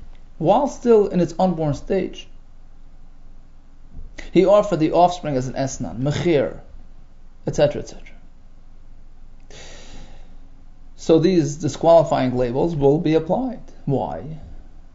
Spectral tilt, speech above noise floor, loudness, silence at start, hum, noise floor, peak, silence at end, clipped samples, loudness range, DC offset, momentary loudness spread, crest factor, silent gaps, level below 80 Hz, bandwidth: -7 dB/octave; 22 dB; -19 LUFS; 0 s; 60 Hz at -50 dBFS; -40 dBFS; -2 dBFS; 0.05 s; under 0.1%; 10 LU; under 0.1%; 18 LU; 18 dB; none; -38 dBFS; 7.8 kHz